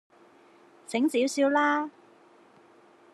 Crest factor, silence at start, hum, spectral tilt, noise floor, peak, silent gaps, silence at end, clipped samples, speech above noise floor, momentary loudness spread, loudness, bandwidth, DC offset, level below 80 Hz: 18 dB; 0.9 s; none; -3 dB/octave; -57 dBFS; -12 dBFS; none; 1.25 s; under 0.1%; 32 dB; 9 LU; -26 LUFS; 13 kHz; under 0.1%; under -90 dBFS